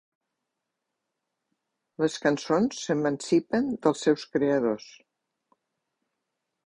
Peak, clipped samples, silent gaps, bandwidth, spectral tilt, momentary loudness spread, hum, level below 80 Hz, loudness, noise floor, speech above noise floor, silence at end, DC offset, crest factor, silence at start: -8 dBFS; under 0.1%; none; 11 kHz; -5.5 dB/octave; 5 LU; none; -68 dBFS; -26 LUFS; -84 dBFS; 58 dB; 1.75 s; under 0.1%; 20 dB; 2 s